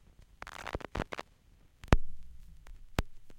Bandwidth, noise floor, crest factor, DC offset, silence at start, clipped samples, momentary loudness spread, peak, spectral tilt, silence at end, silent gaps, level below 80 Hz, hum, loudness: 14.5 kHz; -62 dBFS; 28 dB; under 0.1%; 0.45 s; under 0.1%; 25 LU; -6 dBFS; -6 dB/octave; 0 s; none; -40 dBFS; none; -37 LUFS